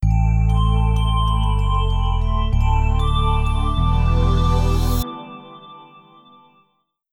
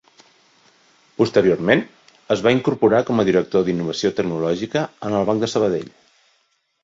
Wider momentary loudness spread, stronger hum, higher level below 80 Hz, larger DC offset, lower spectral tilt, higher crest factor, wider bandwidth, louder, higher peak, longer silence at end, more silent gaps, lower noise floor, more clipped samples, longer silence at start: about the same, 9 LU vs 7 LU; neither; first, -20 dBFS vs -56 dBFS; neither; about the same, -7 dB/octave vs -6 dB/octave; second, 12 dB vs 18 dB; first, 17.5 kHz vs 7.8 kHz; about the same, -20 LUFS vs -19 LUFS; second, -6 dBFS vs -2 dBFS; first, 1.3 s vs 0.95 s; neither; about the same, -67 dBFS vs -66 dBFS; neither; second, 0 s vs 1.2 s